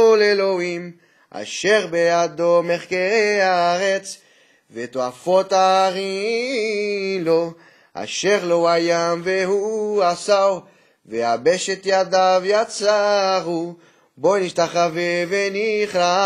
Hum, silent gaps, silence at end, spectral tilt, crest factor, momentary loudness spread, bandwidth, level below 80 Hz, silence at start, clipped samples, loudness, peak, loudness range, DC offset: none; none; 0 s; -3.5 dB/octave; 16 dB; 13 LU; 12 kHz; -70 dBFS; 0 s; under 0.1%; -19 LUFS; -2 dBFS; 2 LU; under 0.1%